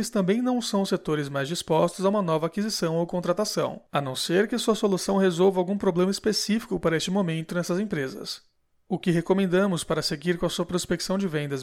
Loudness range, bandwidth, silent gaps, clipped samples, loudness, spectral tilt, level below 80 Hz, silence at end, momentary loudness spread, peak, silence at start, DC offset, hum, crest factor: 3 LU; 16 kHz; none; under 0.1%; -25 LUFS; -5 dB/octave; -56 dBFS; 0 s; 6 LU; -10 dBFS; 0 s; under 0.1%; none; 14 dB